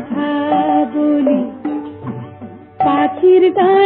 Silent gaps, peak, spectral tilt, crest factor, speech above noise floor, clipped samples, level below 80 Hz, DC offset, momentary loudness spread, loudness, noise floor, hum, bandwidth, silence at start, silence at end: none; -2 dBFS; -10.5 dB/octave; 12 dB; 24 dB; under 0.1%; -58 dBFS; under 0.1%; 18 LU; -14 LUFS; -34 dBFS; none; 4.1 kHz; 0 s; 0 s